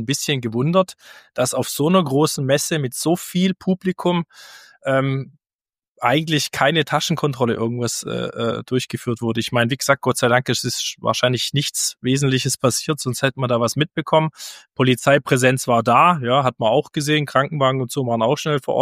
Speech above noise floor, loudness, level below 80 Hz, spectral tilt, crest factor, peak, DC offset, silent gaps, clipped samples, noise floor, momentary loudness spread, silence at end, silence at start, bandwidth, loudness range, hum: over 71 dB; -19 LUFS; -60 dBFS; -4.5 dB/octave; 18 dB; -2 dBFS; under 0.1%; 5.53-5.59 s, 5.88-5.95 s; under 0.1%; under -90 dBFS; 7 LU; 0 s; 0 s; 15.5 kHz; 4 LU; none